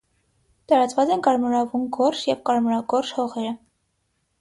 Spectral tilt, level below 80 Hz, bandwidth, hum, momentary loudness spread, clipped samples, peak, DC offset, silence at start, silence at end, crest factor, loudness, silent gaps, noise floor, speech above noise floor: -4.5 dB/octave; -66 dBFS; 11.5 kHz; none; 7 LU; under 0.1%; -4 dBFS; under 0.1%; 0.7 s; 0.85 s; 18 dB; -22 LUFS; none; -71 dBFS; 50 dB